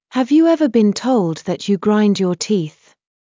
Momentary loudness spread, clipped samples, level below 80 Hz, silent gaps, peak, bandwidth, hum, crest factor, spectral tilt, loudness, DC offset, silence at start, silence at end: 7 LU; under 0.1%; -64 dBFS; none; -4 dBFS; 7.6 kHz; none; 12 dB; -6 dB/octave; -16 LUFS; under 0.1%; 0.15 s; 0.6 s